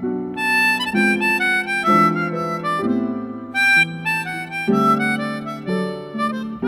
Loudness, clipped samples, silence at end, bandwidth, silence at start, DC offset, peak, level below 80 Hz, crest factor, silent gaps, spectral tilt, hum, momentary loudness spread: -18 LUFS; under 0.1%; 0 s; 16 kHz; 0 s; under 0.1%; -4 dBFS; -58 dBFS; 16 dB; none; -5 dB/octave; none; 10 LU